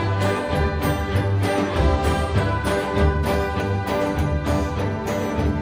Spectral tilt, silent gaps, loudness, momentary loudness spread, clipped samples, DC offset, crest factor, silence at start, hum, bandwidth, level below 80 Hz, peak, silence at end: -6.5 dB/octave; none; -22 LUFS; 3 LU; under 0.1%; under 0.1%; 14 dB; 0 s; none; 16 kHz; -30 dBFS; -6 dBFS; 0 s